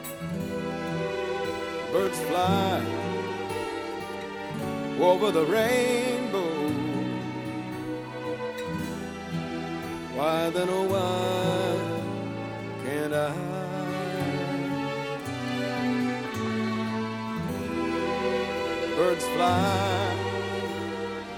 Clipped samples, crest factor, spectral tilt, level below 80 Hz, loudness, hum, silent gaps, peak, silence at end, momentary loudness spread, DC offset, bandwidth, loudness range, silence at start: under 0.1%; 20 dB; -5.5 dB/octave; -58 dBFS; -28 LUFS; none; none; -8 dBFS; 0 s; 10 LU; under 0.1%; over 20 kHz; 4 LU; 0 s